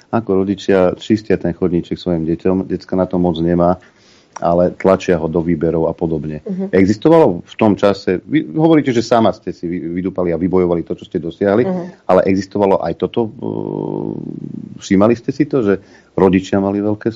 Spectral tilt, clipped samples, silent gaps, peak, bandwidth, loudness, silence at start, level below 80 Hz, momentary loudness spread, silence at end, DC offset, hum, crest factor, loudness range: -7.5 dB/octave; under 0.1%; none; 0 dBFS; 7.8 kHz; -16 LUFS; 0.1 s; -46 dBFS; 10 LU; 0 s; under 0.1%; none; 16 dB; 3 LU